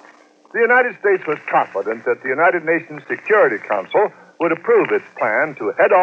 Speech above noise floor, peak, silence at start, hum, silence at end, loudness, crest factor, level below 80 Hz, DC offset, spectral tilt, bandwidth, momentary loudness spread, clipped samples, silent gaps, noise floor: 31 dB; -2 dBFS; 0.55 s; none; 0 s; -18 LUFS; 16 dB; under -90 dBFS; under 0.1%; -7 dB/octave; 6.8 kHz; 8 LU; under 0.1%; none; -48 dBFS